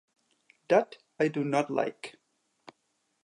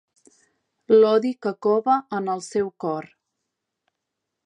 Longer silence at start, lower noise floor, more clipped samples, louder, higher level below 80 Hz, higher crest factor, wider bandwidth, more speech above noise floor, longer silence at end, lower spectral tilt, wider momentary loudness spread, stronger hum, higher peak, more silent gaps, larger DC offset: second, 0.7 s vs 0.9 s; second, -77 dBFS vs -82 dBFS; neither; second, -29 LUFS vs -22 LUFS; second, -84 dBFS vs -72 dBFS; first, 24 dB vs 18 dB; about the same, 11.5 kHz vs 10.5 kHz; second, 49 dB vs 61 dB; second, 1.15 s vs 1.4 s; about the same, -6 dB/octave vs -6 dB/octave; first, 17 LU vs 12 LU; neither; about the same, -8 dBFS vs -6 dBFS; neither; neither